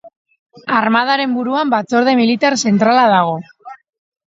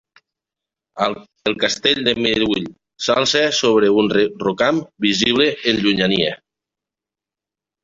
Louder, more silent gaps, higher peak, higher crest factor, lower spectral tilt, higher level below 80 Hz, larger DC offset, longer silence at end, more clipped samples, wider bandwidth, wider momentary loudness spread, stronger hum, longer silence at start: first, -14 LUFS vs -17 LUFS; first, 0.16-0.25 s, 0.39-0.46 s vs none; about the same, 0 dBFS vs 0 dBFS; about the same, 16 dB vs 18 dB; about the same, -4.5 dB/octave vs -3.5 dB/octave; second, -64 dBFS vs -52 dBFS; neither; second, 0.55 s vs 1.5 s; neither; about the same, 7.8 kHz vs 7.8 kHz; about the same, 7 LU vs 8 LU; neither; second, 0.05 s vs 0.95 s